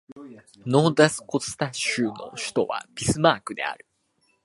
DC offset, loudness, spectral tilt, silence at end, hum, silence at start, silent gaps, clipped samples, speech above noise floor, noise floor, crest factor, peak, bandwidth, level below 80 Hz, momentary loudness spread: under 0.1%; -24 LUFS; -4.5 dB/octave; 0.7 s; none; 0.1 s; 0.12-0.16 s; under 0.1%; 44 dB; -69 dBFS; 24 dB; -2 dBFS; 11.5 kHz; -56 dBFS; 14 LU